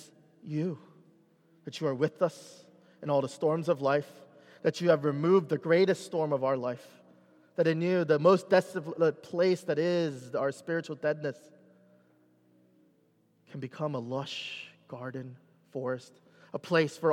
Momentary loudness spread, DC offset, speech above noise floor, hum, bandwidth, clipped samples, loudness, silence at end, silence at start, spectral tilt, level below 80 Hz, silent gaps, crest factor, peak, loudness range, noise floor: 17 LU; under 0.1%; 39 dB; none; 13.5 kHz; under 0.1%; -30 LUFS; 0 s; 0 s; -6.5 dB/octave; -86 dBFS; none; 20 dB; -10 dBFS; 12 LU; -68 dBFS